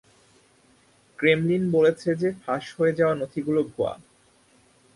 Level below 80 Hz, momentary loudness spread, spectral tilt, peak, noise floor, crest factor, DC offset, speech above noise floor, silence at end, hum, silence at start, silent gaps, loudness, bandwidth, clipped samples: -62 dBFS; 9 LU; -7 dB/octave; -6 dBFS; -60 dBFS; 20 dB; under 0.1%; 37 dB; 1 s; none; 1.2 s; none; -24 LUFS; 11.5 kHz; under 0.1%